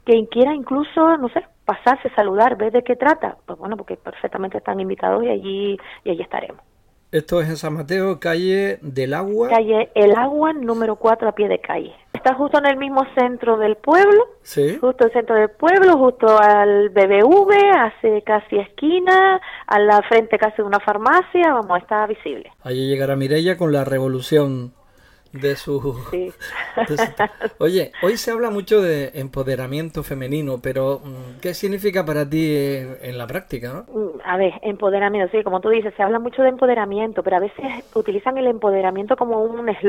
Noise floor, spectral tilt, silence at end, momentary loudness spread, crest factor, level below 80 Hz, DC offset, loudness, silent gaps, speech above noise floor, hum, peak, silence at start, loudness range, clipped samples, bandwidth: -51 dBFS; -6 dB/octave; 0 s; 14 LU; 16 dB; -52 dBFS; under 0.1%; -18 LUFS; none; 34 dB; none; -2 dBFS; 0.05 s; 9 LU; under 0.1%; 16.5 kHz